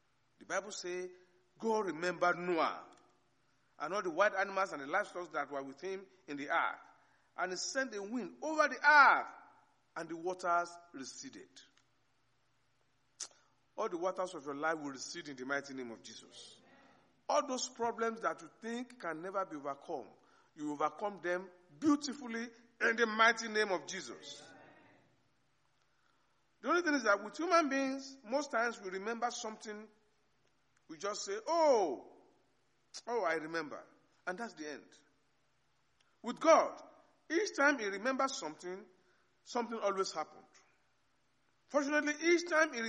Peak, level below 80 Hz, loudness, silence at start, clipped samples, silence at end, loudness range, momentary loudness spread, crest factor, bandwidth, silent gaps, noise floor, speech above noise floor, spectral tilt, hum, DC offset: -14 dBFS; -88 dBFS; -35 LUFS; 0.5 s; under 0.1%; 0 s; 11 LU; 18 LU; 24 dB; 10.5 kHz; none; -78 dBFS; 42 dB; -3 dB/octave; none; under 0.1%